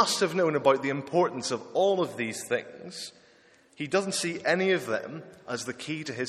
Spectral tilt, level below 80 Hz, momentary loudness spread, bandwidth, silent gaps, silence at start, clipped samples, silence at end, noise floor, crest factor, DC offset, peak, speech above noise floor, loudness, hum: -4 dB/octave; -74 dBFS; 15 LU; 13.5 kHz; none; 0 s; under 0.1%; 0 s; -59 dBFS; 22 dB; under 0.1%; -6 dBFS; 31 dB; -28 LUFS; none